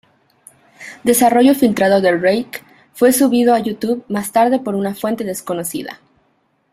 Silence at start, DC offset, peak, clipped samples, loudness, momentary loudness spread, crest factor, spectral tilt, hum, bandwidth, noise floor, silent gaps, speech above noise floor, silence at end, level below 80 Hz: 0.8 s; under 0.1%; -2 dBFS; under 0.1%; -15 LUFS; 15 LU; 16 dB; -4.5 dB/octave; none; 16 kHz; -62 dBFS; none; 47 dB; 0.8 s; -58 dBFS